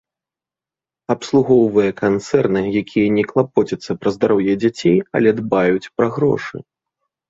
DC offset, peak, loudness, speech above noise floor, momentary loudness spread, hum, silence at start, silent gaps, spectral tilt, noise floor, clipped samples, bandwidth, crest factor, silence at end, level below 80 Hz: under 0.1%; -2 dBFS; -17 LUFS; 73 dB; 8 LU; none; 1.1 s; none; -7 dB/octave; -89 dBFS; under 0.1%; 7.8 kHz; 16 dB; 0.7 s; -54 dBFS